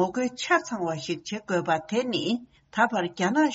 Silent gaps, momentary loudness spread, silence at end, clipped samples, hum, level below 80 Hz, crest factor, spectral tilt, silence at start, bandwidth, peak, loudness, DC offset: none; 8 LU; 0 s; under 0.1%; none; -68 dBFS; 18 dB; -3 dB/octave; 0 s; 8 kHz; -8 dBFS; -27 LUFS; under 0.1%